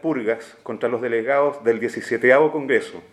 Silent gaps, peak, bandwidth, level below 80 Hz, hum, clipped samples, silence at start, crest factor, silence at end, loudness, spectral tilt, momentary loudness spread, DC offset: none; -2 dBFS; 12 kHz; -72 dBFS; none; under 0.1%; 0.05 s; 18 dB; 0.1 s; -20 LUFS; -6 dB/octave; 10 LU; under 0.1%